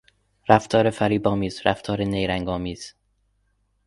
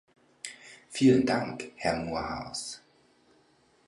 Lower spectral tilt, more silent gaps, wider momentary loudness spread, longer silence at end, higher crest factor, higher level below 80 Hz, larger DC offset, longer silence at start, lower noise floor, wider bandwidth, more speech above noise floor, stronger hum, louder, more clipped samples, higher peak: about the same, -6 dB/octave vs -5 dB/octave; neither; second, 14 LU vs 20 LU; second, 0.95 s vs 1.1 s; about the same, 24 dB vs 20 dB; first, -46 dBFS vs -58 dBFS; neither; about the same, 0.5 s vs 0.45 s; about the same, -68 dBFS vs -65 dBFS; about the same, 11.5 kHz vs 11.5 kHz; first, 46 dB vs 37 dB; first, 50 Hz at -40 dBFS vs none; first, -22 LUFS vs -29 LUFS; neither; first, 0 dBFS vs -12 dBFS